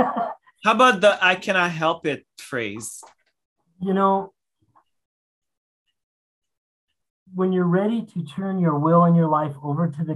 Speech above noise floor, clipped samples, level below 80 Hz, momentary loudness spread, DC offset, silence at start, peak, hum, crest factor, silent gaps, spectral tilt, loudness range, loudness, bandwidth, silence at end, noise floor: 43 dB; under 0.1%; -70 dBFS; 15 LU; under 0.1%; 0 s; -4 dBFS; none; 20 dB; 3.45-3.56 s, 5.05-5.42 s, 5.57-5.86 s, 6.03-6.42 s, 6.57-6.87 s, 7.10-7.26 s; -6 dB/octave; 8 LU; -21 LUFS; 12 kHz; 0 s; -63 dBFS